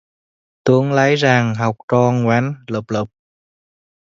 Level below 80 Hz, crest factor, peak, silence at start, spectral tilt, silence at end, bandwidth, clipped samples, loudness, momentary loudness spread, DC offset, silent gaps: -58 dBFS; 18 dB; 0 dBFS; 0.65 s; -6.5 dB/octave; 1.05 s; 7.6 kHz; under 0.1%; -17 LUFS; 10 LU; under 0.1%; 1.83-1.88 s